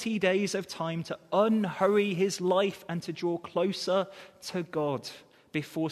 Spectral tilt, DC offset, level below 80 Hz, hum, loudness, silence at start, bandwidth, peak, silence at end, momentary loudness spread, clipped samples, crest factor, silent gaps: -5.5 dB/octave; under 0.1%; -74 dBFS; none; -30 LUFS; 0 s; 13.5 kHz; -12 dBFS; 0 s; 11 LU; under 0.1%; 18 dB; none